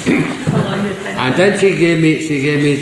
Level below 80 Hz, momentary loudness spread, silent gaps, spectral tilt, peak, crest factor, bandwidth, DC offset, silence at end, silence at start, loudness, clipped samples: -48 dBFS; 7 LU; none; -6 dB/octave; -2 dBFS; 12 dB; 12.5 kHz; under 0.1%; 0 s; 0 s; -14 LUFS; under 0.1%